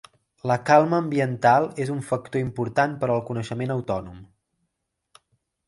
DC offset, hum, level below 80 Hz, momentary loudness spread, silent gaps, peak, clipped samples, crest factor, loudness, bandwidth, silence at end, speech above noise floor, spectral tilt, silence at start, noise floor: under 0.1%; none; -56 dBFS; 12 LU; none; -4 dBFS; under 0.1%; 20 dB; -23 LUFS; 11.5 kHz; 1.45 s; 56 dB; -7 dB/octave; 0.45 s; -79 dBFS